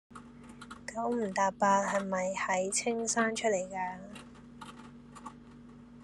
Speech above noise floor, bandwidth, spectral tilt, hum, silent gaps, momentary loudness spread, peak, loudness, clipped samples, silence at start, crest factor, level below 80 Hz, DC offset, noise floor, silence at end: 21 dB; 12.5 kHz; -3.5 dB/octave; none; none; 23 LU; -14 dBFS; -31 LUFS; under 0.1%; 0.1 s; 20 dB; -66 dBFS; under 0.1%; -52 dBFS; 0 s